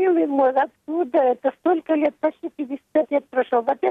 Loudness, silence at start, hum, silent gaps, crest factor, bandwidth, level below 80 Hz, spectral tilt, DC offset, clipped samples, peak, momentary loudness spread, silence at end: -22 LUFS; 0 s; none; none; 14 dB; 4.1 kHz; -72 dBFS; -7 dB/octave; under 0.1%; under 0.1%; -8 dBFS; 7 LU; 0 s